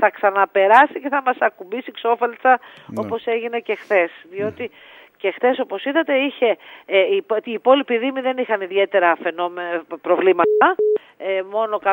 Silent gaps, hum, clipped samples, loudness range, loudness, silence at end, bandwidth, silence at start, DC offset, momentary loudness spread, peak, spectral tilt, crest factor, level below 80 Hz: none; none; under 0.1%; 4 LU; -19 LUFS; 0 s; 16 kHz; 0 s; under 0.1%; 11 LU; 0 dBFS; -6 dB/octave; 18 dB; -74 dBFS